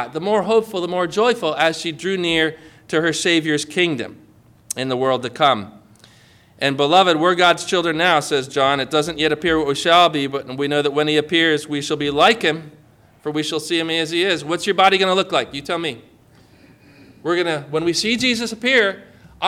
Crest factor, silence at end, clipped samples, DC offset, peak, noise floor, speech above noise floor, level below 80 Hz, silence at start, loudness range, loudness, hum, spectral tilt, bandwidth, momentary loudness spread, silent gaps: 16 dB; 0 s; under 0.1%; under 0.1%; -2 dBFS; -50 dBFS; 32 dB; -54 dBFS; 0 s; 4 LU; -18 LUFS; none; -3.5 dB/octave; 16 kHz; 10 LU; none